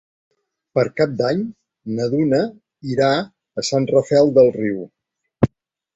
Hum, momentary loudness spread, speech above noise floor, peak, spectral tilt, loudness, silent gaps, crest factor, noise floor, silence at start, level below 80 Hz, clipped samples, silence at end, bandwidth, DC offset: none; 15 LU; 28 dB; -2 dBFS; -6 dB/octave; -19 LUFS; none; 18 dB; -45 dBFS; 0.75 s; -50 dBFS; under 0.1%; 0.5 s; 8.2 kHz; under 0.1%